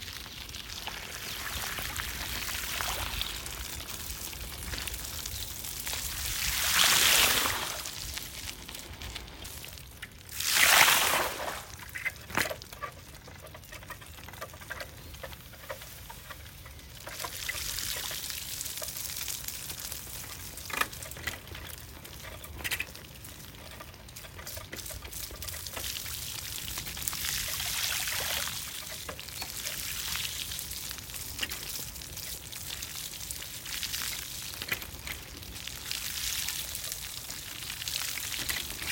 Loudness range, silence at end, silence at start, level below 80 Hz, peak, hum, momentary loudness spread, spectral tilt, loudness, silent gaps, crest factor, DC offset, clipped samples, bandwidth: 13 LU; 0 s; 0 s; -50 dBFS; -4 dBFS; none; 16 LU; -0.5 dB/octave; -31 LUFS; none; 30 dB; under 0.1%; under 0.1%; 19 kHz